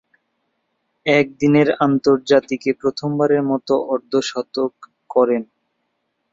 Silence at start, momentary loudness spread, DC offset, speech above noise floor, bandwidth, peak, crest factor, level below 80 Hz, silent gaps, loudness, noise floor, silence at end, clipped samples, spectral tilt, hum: 1.05 s; 9 LU; under 0.1%; 54 dB; 7.8 kHz; -2 dBFS; 18 dB; -62 dBFS; none; -18 LUFS; -72 dBFS; 0.9 s; under 0.1%; -6 dB/octave; none